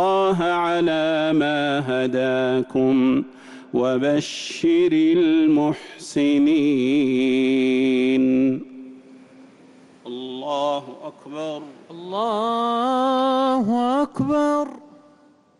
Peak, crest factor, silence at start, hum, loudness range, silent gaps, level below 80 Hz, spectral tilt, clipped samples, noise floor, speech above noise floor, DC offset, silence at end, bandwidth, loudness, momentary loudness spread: -12 dBFS; 10 dB; 0 s; none; 8 LU; none; -62 dBFS; -6 dB/octave; under 0.1%; -54 dBFS; 35 dB; under 0.1%; 0.8 s; 11.5 kHz; -20 LUFS; 14 LU